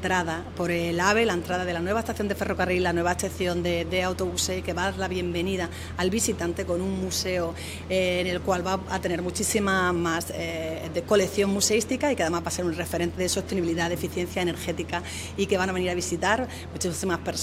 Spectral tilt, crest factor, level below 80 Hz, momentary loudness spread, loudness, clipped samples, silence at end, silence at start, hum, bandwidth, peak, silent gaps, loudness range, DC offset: -4 dB/octave; 20 dB; -50 dBFS; 7 LU; -26 LUFS; under 0.1%; 0 s; 0 s; none; 16 kHz; -6 dBFS; none; 2 LU; under 0.1%